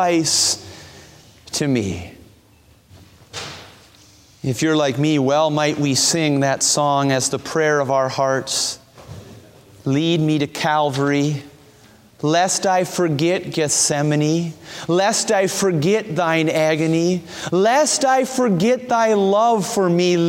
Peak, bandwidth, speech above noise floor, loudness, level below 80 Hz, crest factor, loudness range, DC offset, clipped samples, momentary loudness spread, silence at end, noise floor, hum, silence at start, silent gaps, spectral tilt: -4 dBFS; 16.5 kHz; 34 dB; -18 LUFS; -58 dBFS; 16 dB; 7 LU; under 0.1%; under 0.1%; 13 LU; 0 s; -52 dBFS; none; 0 s; none; -4 dB/octave